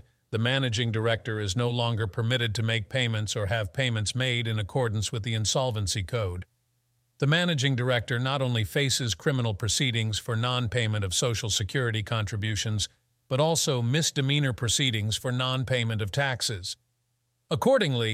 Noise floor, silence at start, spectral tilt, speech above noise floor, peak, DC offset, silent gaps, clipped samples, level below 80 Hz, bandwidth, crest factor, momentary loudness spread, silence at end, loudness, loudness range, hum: -75 dBFS; 0.3 s; -4 dB/octave; 48 dB; -8 dBFS; under 0.1%; none; under 0.1%; -54 dBFS; 15.5 kHz; 18 dB; 5 LU; 0 s; -27 LUFS; 2 LU; none